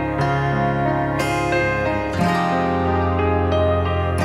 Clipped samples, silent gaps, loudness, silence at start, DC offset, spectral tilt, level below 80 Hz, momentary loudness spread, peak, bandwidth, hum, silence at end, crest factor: under 0.1%; none; -20 LUFS; 0 s; under 0.1%; -7 dB/octave; -38 dBFS; 2 LU; -6 dBFS; 13.5 kHz; none; 0 s; 14 dB